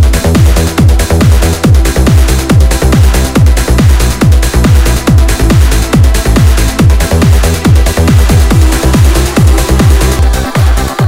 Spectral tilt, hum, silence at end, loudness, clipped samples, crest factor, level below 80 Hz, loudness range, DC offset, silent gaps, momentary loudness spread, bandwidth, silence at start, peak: -5.5 dB/octave; none; 0 s; -8 LUFS; 7%; 6 dB; -8 dBFS; 0 LU; under 0.1%; none; 1 LU; 16.5 kHz; 0 s; 0 dBFS